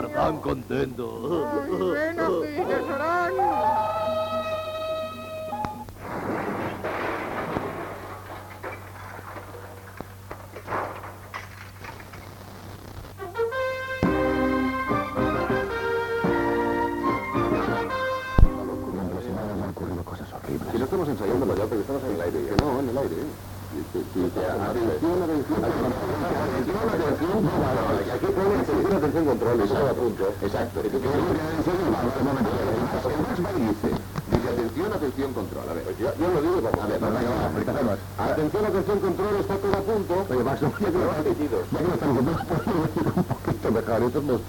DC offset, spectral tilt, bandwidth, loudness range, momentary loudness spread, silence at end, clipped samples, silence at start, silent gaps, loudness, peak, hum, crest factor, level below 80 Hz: under 0.1%; -7 dB/octave; 19 kHz; 9 LU; 14 LU; 0 s; under 0.1%; 0 s; none; -26 LUFS; -2 dBFS; none; 24 dB; -38 dBFS